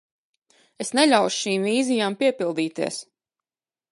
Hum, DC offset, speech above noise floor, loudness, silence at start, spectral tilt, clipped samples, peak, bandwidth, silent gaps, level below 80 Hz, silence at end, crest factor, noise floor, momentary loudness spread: none; under 0.1%; over 68 dB; -22 LUFS; 0.8 s; -3.5 dB/octave; under 0.1%; -4 dBFS; 11.5 kHz; none; -78 dBFS; 0.9 s; 20 dB; under -90 dBFS; 11 LU